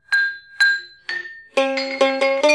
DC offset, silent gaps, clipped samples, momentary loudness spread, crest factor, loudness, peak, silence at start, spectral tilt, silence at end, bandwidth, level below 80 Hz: under 0.1%; none; under 0.1%; 11 LU; 14 dB; -20 LUFS; -6 dBFS; 0.1 s; -0.5 dB/octave; 0 s; 11 kHz; -72 dBFS